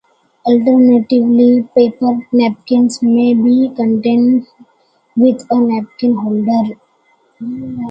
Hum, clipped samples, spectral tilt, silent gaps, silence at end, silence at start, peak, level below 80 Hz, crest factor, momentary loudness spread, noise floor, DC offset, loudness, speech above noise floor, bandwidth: none; under 0.1%; -7 dB/octave; none; 0 s; 0.45 s; 0 dBFS; -58 dBFS; 12 dB; 12 LU; -55 dBFS; under 0.1%; -13 LUFS; 44 dB; 8.8 kHz